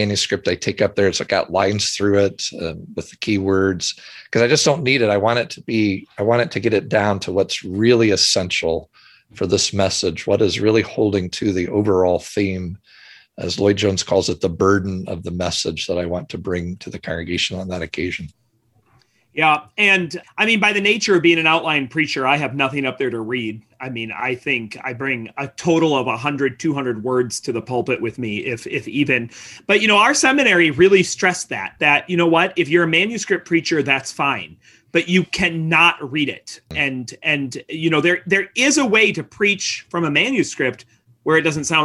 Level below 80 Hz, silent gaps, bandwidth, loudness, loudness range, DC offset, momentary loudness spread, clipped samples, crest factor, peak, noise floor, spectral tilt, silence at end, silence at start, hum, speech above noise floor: -46 dBFS; none; 12.5 kHz; -18 LUFS; 6 LU; under 0.1%; 12 LU; under 0.1%; 18 dB; -2 dBFS; -61 dBFS; -4 dB/octave; 0 s; 0 s; none; 42 dB